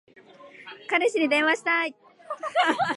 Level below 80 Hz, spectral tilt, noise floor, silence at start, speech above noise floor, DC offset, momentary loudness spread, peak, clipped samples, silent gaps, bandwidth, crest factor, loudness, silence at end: -80 dBFS; -3 dB/octave; -49 dBFS; 0.4 s; 25 dB; under 0.1%; 19 LU; -8 dBFS; under 0.1%; none; 11.5 kHz; 18 dB; -24 LUFS; 0 s